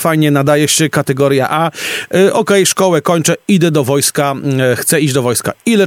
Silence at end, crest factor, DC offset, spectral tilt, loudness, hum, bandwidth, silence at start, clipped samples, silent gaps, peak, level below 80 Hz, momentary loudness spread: 0 s; 12 dB; under 0.1%; -4.5 dB/octave; -12 LUFS; none; 17.5 kHz; 0 s; under 0.1%; none; 0 dBFS; -56 dBFS; 5 LU